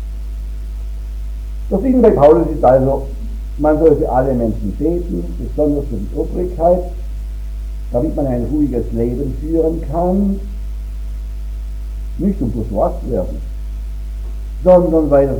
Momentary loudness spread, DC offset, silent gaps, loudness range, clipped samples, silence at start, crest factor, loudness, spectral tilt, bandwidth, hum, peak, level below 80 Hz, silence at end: 16 LU; under 0.1%; none; 8 LU; under 0.1%; 0 s; 16 dB; -16 LUFS; -9.5 dB/octave; 10 kHz; none; 0 dBFS; -24 dBFS; 0 s